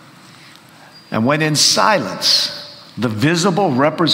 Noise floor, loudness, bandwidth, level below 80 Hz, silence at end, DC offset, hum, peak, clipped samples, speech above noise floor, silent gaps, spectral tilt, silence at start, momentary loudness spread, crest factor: -43 dBFS; -15 LUFS; 16.5 kHz; -58 dBFS; 0 s; under 0.1%; none; 0 dBFS; under 0.1%; 28 dB; none; -3.5 dB/octave; 0.95 s; 12 LU; 16 dB